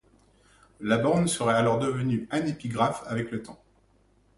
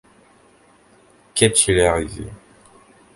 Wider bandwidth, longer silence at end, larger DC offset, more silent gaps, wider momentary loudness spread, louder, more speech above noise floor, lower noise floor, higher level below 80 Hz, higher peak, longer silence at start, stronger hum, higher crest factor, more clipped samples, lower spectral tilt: about the same, 11.5 kHz vs 11.5 kHz; about the same, 0.85 s vs 0.8 s; neither; neither; second, 12 LU vs 19 LU; second, -27 LUFS vs -17 LUFS; about the same, 37 dB vs 36 dB; first, -63 dBFS vs -53 dBFS; second, -58 dBFS vs -40 dBFS; second, -8 dBFS vs 0 dBFS; second, 0.8 s vs 1.35 s; neither; about the same, 20 dB vs 22 dB; neither; first, -5.5 dB/octave vs -3 dB/octave